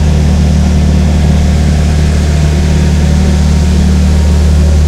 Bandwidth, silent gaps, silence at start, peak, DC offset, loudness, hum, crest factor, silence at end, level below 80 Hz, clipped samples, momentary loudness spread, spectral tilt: 11.5 kHz; none; 0 s; 0 dBFS; under 0.1%; -9 LUFS; none; 8 dB; 0 s; -12 dBFS; 0.6%; 1 LU; -6.5 dB/octave